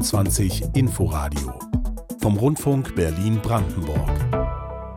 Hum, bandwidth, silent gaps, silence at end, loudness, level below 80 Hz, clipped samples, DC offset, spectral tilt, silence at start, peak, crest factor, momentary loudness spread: none; 17.5 kHz; none; 0 s; -23 LUFS; -30 dBFS; under 0.1%; under 0.1%; -6 dB/octave; 0 s; -8 dBFS; 12 dB; 7 LU